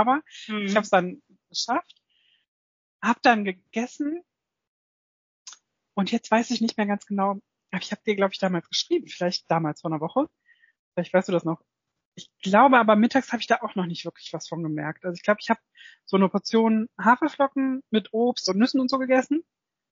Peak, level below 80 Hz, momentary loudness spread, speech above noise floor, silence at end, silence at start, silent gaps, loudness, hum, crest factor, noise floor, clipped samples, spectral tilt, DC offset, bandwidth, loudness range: -4 dBFS; -74 dBFS; 12 LU; 43 dB; 0.5 s; 0 s; 2.48-3.00 s, 4.68-5.45 s, 10.79-10.92 s, 12.05-12.12 s; -24 LUFS; none; 20 dB; -67 dBFS; under 0.1%; -5 dB/octave; under 0.1%; 7.6 kHz; 5 LU